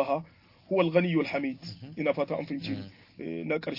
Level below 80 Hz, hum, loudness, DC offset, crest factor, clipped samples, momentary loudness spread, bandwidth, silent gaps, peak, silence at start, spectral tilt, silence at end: -70 dBFS; none; -30 LUFS; under 0.1%; 20 dB; under 0.1%; 16 LU; 5.8 kHz; none; -10 dBFS; 0 s; -8 dB/octave; 0 s